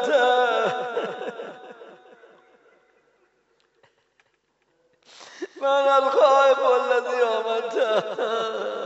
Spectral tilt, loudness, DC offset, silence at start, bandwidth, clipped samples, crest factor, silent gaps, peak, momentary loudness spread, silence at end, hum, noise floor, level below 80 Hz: 0 dB/octave; -21 LUFS; under 0.1%; 0 s; 8 kHz; under 0.1%; 18 dB; none; -6 dBFS; 20 LU; 0 s; none; -69 dBFS; -82 dBFS